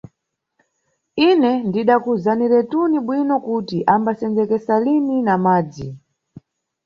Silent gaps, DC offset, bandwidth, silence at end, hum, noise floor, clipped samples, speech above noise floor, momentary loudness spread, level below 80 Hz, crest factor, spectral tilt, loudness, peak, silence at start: none; under 0.1%; 7 kHz; 0.9 s; none; -75 dBFS; under 0.1%; 58 dB; 5 LU; -58 dBFS; 16 dB; -8 dB/octave; -18 LUFS; -2 dBFS; 1.15 s